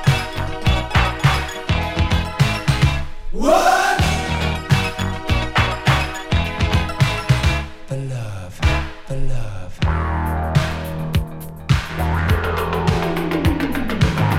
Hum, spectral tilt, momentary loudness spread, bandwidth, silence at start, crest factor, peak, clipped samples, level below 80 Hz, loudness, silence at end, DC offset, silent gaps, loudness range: none; -5.5 dB/octave; 10 LU; 16.5 kHz; 0 s; 16 dB; -2 dBFS; under 0.1%; -26 dBFS; -20 LUFS; 0 s; under 0.1%; none; 4 LU